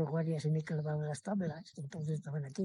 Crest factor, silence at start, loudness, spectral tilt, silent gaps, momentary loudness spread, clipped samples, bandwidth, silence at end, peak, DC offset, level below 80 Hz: 14 dB; 0 s; -38 LUFS; -7.5 dB/octave; none; 7 LU; under 0.1%; 11 kHz; 0 s; -22 dBFS; under 0.1%; -78 dBFS